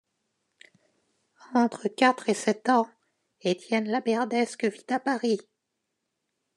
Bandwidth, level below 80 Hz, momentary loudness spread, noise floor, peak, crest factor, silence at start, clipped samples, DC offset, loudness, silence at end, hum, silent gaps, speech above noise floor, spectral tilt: 11 kHz; -88 dBFS; 7 LU; -81 dBFS; -6 dBFS; 22 dB; 1.5 s; under 0.1%; under 0.1%; -27 LUFS; 1.15 s; none; none; 56 dB; -4.5 dB/octave